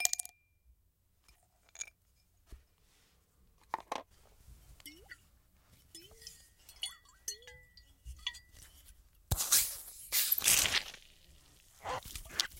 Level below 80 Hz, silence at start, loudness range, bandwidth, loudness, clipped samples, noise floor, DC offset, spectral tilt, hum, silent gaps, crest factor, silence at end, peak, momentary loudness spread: -56 dBFS; 0 s; 19 LU; 17 kHz; -33 LUFS; under 0.1%; -73 dBFS; under 0.1%; 0 dB/octave; none; none; 36 dB; 0 s; -4 dBFS; 27 LU